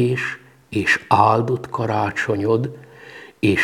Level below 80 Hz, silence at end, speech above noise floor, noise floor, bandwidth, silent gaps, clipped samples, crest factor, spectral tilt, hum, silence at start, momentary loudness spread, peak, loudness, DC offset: -54 dBFS; 0 s; 22 dB; -41 dBFS; 15.5 kHz; none; under 0.1%; 20 dB; -6 dB/octave; none; 0 s; 23 LU; 0 dBFS; -20 LUFS; under 0.1%